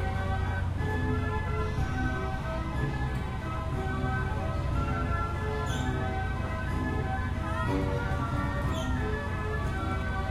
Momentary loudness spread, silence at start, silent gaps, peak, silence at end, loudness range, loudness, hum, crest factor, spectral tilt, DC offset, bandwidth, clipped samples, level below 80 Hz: 3 LU; 0 s; none; -16 dBFS; 0 s; 1 LU; -31 LUFS; none; 14 dB; -7 dB/octave; under 0.1%; 13 kHz; under 0.1%; -36 dBFS